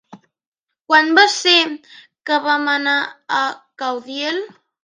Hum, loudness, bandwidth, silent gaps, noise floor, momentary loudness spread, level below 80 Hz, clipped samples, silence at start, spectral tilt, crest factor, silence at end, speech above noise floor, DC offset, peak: none; -16 LUFS; 10 kHz; 0.47-0.52 s, 0.59-0.63 s, 0.81-0.85 s; -82 dBFS; 14 LU; -74 dBFS; under 0.1%; 0.1 s; -0.5 dB/octave; 18 dB; 0.35 s; 64 dB; under 0.1%; 0 dBFS